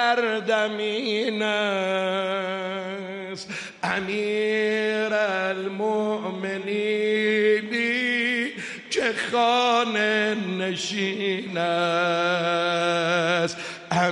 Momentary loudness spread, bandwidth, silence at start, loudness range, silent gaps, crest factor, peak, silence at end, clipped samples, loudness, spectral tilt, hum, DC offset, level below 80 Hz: 8 LU; 11.5 kHz; 0 s; 4 LU; none; 16 dB; -10 dBFS; 0 s; under 0.1%; -24 LUFS; -4 dB/octave; none; under 0.1%; -72 dBFS